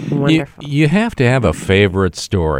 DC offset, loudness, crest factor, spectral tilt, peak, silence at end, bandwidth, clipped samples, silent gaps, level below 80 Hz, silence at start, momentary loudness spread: under 0.1%; -15 LUFS; 14 dB; -6.5 dB/octave; 0 dBFS; 0 s; 15.5 kHz; under 0.1%; none; -34 dBFS; 0 s; 5 LU